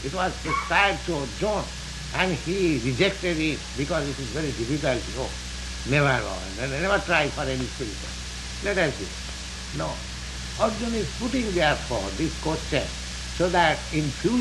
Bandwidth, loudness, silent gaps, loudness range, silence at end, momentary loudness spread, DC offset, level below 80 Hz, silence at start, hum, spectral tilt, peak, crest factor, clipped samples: 12 kHz; -26 LUFS; none; 4 LU; 0 s; 12 LU; under 0.1%; -38 dBFS; 0 s; none; -4.5 dB/octave; -6 dBFS; 20 dB; under 0.1%